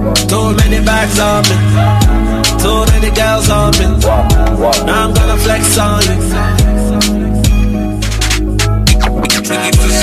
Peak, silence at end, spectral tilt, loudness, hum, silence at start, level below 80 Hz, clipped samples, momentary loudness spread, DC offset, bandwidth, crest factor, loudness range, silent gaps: 0 dBFS; 0 s; -4.5 dB/octave; -11 LUFS; none; 0 s; -14 dBFS; under 0.1%; 3 LU; under 0.1%; 15 kHz; 10 dB; 2 LU; none